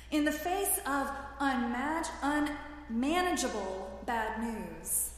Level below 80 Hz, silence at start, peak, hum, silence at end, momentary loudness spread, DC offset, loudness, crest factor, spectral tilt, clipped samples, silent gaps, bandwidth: -52 dBFS; 0 s; -16 dBFS; none; 0 s; 8 LU; under 0.1%; -33 LUFS; 16 dB; -3 dB/octave; under 0.1%; none; 15.5 kHz